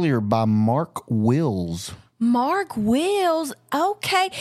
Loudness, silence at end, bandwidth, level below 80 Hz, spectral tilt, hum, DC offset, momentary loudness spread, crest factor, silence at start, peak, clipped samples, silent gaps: -22 LUFS; 0 s; 14.5 kHz; -54 dBFS; -6 dB/octave; none; under 0.1%; 7 LU; 16 dB; 0 s; -4 dBFS; under 0.1%; none